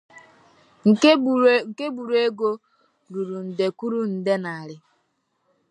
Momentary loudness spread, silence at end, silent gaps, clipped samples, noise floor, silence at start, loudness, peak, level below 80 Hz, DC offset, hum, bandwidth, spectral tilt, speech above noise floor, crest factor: 16 LU; 0.95 s; none; under 0.1%; -71 dBFS; 0.15 s; -21 LUFS; -4 dBFS; -78 dBFS; under 0.1%; none; 10.5 kHz; -5.5 dB/octave; 50 dB; 20 dB